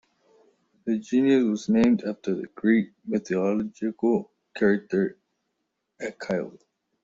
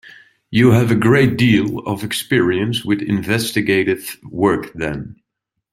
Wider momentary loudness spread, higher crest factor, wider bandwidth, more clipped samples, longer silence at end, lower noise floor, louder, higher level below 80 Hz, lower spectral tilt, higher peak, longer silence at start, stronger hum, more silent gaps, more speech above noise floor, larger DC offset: about the same, 13 LU vs 11 LU; about the same, 16 dB vs 16 dB; second, 7.6 kHz vs 16 kHz; neither; about the same, 0.55 s vs 0.6 s; about the same, -79 dBFS vs -78 dBFS; second, -25 LUFS vs -17 LUFS; second, -64 dBFS vs -46 dBFS; about the same, -7 dB/octave vs -6 dB/octave; second, -10 dBFS vs -2 dBFS; first, 0.85 s vs 0.5 s; neither; neither; second, 55 dB vs 62 dB; neither